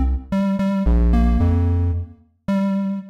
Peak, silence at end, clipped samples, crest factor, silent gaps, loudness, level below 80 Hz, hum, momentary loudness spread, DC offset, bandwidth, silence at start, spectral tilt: -8 dBFS; 0 s; under 0.1%; 10 dB; none; -20 LUFS; -22 dBFS; none; 8 LU; under 0.1%; 6.4 kHz; 0 s; -9.5 dB/octave